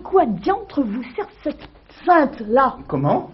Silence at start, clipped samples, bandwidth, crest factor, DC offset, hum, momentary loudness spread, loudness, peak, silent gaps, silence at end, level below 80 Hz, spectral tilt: 0 s; under 0.1%; 5.8 kHz; 16 dB; under 0.1%; none; 13 LU; -20 LUFS; -2 dBFS; none; 0 s; -48 dBFS; -6 dB/octave